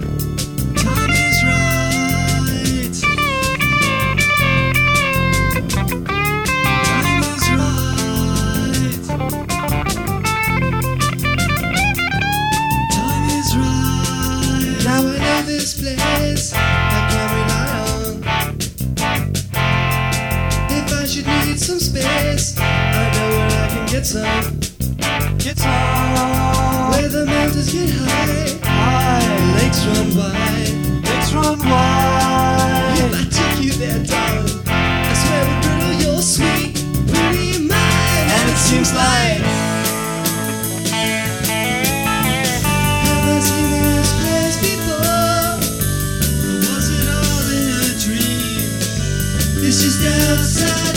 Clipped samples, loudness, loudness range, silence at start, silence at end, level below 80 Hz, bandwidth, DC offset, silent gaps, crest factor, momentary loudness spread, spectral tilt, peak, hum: under 0.1%; -16 LUFS; 3 LU; 0 s; 0 s; -28 dBFS; over 20 kHz; 0.2%; none; 16 dB; 5 LU; -4 dB/octave; 0 dBFS; none